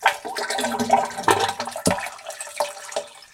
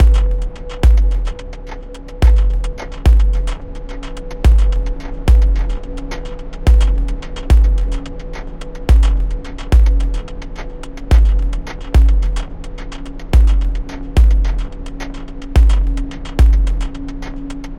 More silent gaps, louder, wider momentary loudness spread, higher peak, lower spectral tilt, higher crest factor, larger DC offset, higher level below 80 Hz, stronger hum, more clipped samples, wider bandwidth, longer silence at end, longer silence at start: neither; second, -24 LUFS vs -16 LUFS; second, 12 LU vs 17 LU; about the same, 0 dBFS vs 0 dBFS; second, -2.5 dB/octave vs -7 dB/octave; first, 24 dB vs 14 dB; neither; second, -56 dBFS vs -14 dBFS; neither; neither; first, 17 kHz vs 8.4 kHz; about the same, 0.1 s vs 0 s; about the same, 0 s vs 0 s